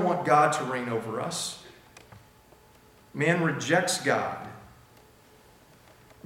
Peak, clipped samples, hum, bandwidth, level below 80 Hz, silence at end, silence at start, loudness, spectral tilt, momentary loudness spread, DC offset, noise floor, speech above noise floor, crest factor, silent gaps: -8 dBFS; under 0.1%; none; 17.5 kHz; -66 dBFS; 1.6 s; 0 s; -26 LUFS; -4 dB/octave; 17 LU; under 0.1%; -56 dBFS; 30 dB; 22 dB; none